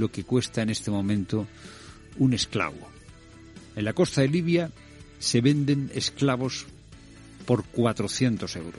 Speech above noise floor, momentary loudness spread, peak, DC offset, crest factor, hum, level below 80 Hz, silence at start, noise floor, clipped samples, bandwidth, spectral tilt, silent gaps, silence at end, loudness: 23 dB; 18 LU; -8 dBFS; under 0.1%; 20 dB; none; -54 dBFS; 0 s; -48 dBFS; under 0.1%; 11.5 kHz; -5.5 dB/octave; none; 0 s; -26 LUFS